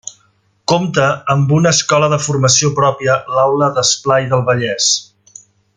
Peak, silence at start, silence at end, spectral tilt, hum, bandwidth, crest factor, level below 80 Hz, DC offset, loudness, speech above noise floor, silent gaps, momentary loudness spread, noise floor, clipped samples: 0 dBFS; 0.05 s; 0.75 s; -3.5 dB/octave; none; 9.6 kHz; 14 dB; -52 dBFS; under 0.1%; -13 LUFS; 44 dB; none; 5 LU; -57 dBFS; under 0.1%